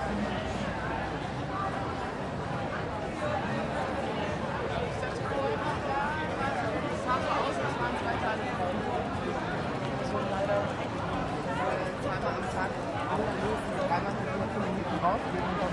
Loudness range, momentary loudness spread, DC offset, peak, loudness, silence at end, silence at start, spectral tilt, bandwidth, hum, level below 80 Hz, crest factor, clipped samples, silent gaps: 2 LU; 4 LU; under 0.1%; -16 dBFS; -31 LUFS; 0 s; 0 s; -6 dB/octave; 11.5 kHz; none; -48 dBFS; 16 dB; under 0.1%; none